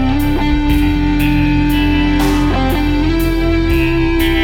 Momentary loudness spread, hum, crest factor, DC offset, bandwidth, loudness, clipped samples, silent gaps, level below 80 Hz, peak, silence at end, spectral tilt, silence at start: 2 LU; none; 12 dB; under 0.1%; 17 kHz; -14 LUFS; under 0.1%; none; -18 dBFS; -2 dBFS; 0 s; -6.5 dB/octave; 0 s